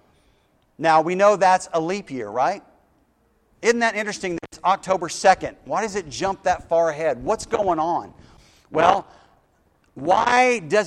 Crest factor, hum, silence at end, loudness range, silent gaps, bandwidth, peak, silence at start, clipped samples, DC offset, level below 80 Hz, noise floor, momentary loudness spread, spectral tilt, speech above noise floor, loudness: 22 dB; none; 0 s; 3 LU; none; 12 kHz; 0 dBFS; 0.8 s; under 0.1%; under 0.1%; -54 dBFS; -63 dBFS; 10 LU; -4 dB/octave; 42 dB; -21 LUFS